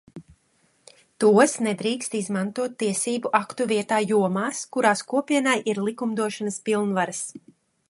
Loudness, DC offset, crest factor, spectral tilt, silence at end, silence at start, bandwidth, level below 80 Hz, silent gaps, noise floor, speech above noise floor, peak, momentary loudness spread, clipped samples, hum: -23 LUFS; under 0.1%; 20 dB; -4 dB/octave; 0.5 s; 0.15 s; 11.5 kHz; -70 dBFS; none; -65 dBFS; 42 dB; -4 dBFS; 8 LU; under 0.1%; none